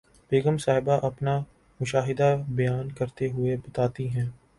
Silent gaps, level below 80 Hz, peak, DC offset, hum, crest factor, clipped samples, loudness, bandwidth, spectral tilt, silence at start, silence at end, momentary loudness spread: none; -54 dBFS; -10 dBFS; under 0.1%; none; 16 dB; under 0.1%; -27 LUFS; 11.5 kHz; -7 dB/octave; 0.3 s; 0.25 s; 7 LU